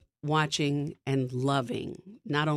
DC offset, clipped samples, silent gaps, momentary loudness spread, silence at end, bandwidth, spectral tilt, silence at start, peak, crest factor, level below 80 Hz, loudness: under 0.1%; under 0.1%; none; 9 LU; 0 s; 12 kHz; -5.5 dB/octave; 0.25 s; -14 dBFS; 16 dB; -66 dBFS; -30 LUFS